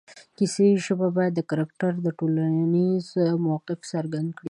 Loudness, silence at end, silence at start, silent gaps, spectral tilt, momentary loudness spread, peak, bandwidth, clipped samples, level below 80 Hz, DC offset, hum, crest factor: -24 LUFS; 0 s; 0.1 s; none; -7 dB/octave; 9 LU; -10 dBFS; 11 kHz; under 0.1%; -72 dBFS; under 0.1%; none; 14 dB